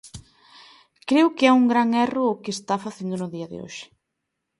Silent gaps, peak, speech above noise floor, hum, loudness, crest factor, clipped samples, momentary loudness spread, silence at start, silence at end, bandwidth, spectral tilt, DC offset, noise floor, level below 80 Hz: none; -4 dBFS; 59 dB; none; -21 LUFS; 20 dB; under 0.1%; 19 LU; 0.05 s; 0.75 s; 11.5 kHz; -5 dB/octave; under 0.1%; -80 dBFS; -62 dBFS